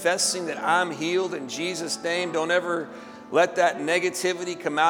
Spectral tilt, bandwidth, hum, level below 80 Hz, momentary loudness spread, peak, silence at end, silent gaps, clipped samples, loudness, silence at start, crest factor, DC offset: -2.5 dB/octave; 18.5 kHz; none; -74 dBFS; 7 LU; -6 dBFS; 0 s; none; under 0.1%; -25 LUFS; 0 s; 18 dB; under 0.1%